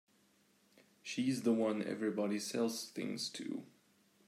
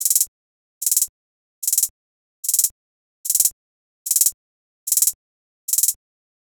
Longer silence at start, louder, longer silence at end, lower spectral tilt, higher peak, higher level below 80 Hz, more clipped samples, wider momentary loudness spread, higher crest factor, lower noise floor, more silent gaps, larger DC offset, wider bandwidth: first, 1.05 s vs 0 s; second, -38 LUFS vs -19 LUFS; about the same, 0.65 s vs 0.55 s; first, -4.5 dB/octave vs 5 dB/octave; second, -22 dBFS vs 0 dBFS; second, -88 dBFS vs -66 dBFS; neither; about the same, 11 LU vs 11 LU; about the same, 18 dB vs 22 dB; second, -72 dBFS vs under -90 dBFS; second, none vs 0.28-0.81 s, 1.09-1.62 s, 1.90-2.43 s, 2.71-3.24 s, 3.52-4.05 s, 4.34-4.86 s, 5.15-5.68 s; neither; second, 15.5 kHz vs over 20 kHz